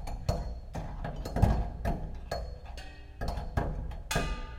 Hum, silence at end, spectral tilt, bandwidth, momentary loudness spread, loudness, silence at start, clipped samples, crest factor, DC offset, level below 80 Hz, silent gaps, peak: none; 0 s; -6 dB/octave; 16.5 kHz; 14 LU; -35 LUFS; 0 s; under 0.1%; 24 dB; under 0.1%; -36 dBFS; none; -10 dBFS